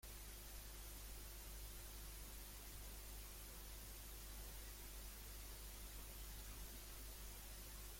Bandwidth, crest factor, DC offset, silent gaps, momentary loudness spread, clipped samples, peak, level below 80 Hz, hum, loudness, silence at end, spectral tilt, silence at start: 16.5 kHz; 14 dB; under 0.1%; none; 1 LU; under 0.1%; -40 dBFS; -56 dBFS; none; -55 LUFS; 0 s; -2.5 dB/octave; 0.05 s